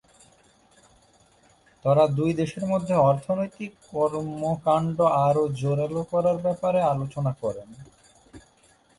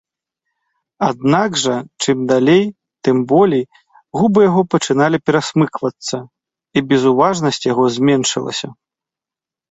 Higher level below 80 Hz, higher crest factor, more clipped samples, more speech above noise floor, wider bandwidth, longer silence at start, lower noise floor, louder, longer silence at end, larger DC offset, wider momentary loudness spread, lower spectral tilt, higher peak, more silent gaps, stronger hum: about the same, -58 dBFS vs -56 dBFS; about the same, 18 dB vs 14 dB; neither; second, 36 dB vs 74 dB; first, 11.5 kHz vs 8.2 kHz; first, 1.85 s vs 1 s; second, -60 dBFS vs -88 dBFS; second, -24 LUFS vs -15 LUFS; second, 0.6 s vs 0.95 s; neither; about the same, 9 LU vs 11 LU; first, -8 dB/octave vs -5 dB/octave; second, -8 dBFS vs -2 dBFS; neither; neither